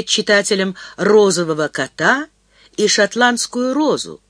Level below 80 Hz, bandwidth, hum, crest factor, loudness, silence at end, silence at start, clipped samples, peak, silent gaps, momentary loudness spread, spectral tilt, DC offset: -62 dBFS; 11 kHz; none; 16 dB; -16 LUFS; 0.15 s; 0 s; under 0.1%; 0 dBFS; none; 8 LU; -3 dB/octave; under 0.1%